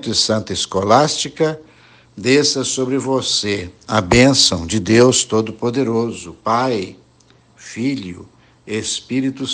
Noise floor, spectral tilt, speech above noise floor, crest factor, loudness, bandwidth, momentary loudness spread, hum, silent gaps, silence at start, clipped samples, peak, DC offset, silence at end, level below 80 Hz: -51 dBFS; -3.5 dB/octave; 35 dB; 18 dB; -16 LUFS; 10.5 kHz; 13 LU; none; none; 0 s; under 0.1%; 0 dBFS; under 0.1%; 0 s; -44 dBFS